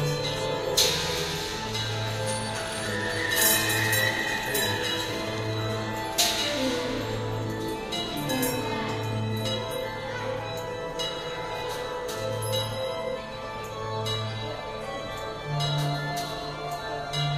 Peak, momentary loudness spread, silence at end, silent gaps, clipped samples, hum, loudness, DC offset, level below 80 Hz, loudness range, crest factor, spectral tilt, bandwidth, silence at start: -8 dBFS; 11 LU; 0 s; none; under 0.1%; none; -28 LUFS; under 0.1%; -50 dBFS; 6 LU; 22 dB; -3 dB/octave; 15.5 kHz; 0 s